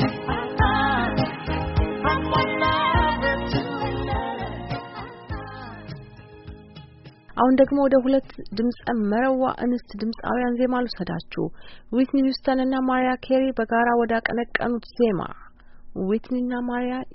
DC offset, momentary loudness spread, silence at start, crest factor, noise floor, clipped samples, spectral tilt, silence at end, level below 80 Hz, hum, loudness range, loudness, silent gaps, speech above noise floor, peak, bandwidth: under 0.1%; 15 LU; 0 s; 20 dB; -46 dBFS; under 0.1%; -4.5 dB/octave; 0 s; -38 dBFS; none; 6 LU; -23 LUFS; none; 23 dB; -4 dBFS; 5.8 kHz